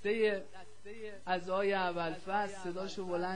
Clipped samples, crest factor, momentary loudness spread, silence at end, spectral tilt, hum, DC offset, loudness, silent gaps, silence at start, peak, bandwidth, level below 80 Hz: under 0.1%; 16 dB; 16 LU; 0 s; -5 dB/octave; none; 0.5%; -36 LUFS; none; 0.05 s; -20 dBFS; 10.5 kHz; -70 dBFS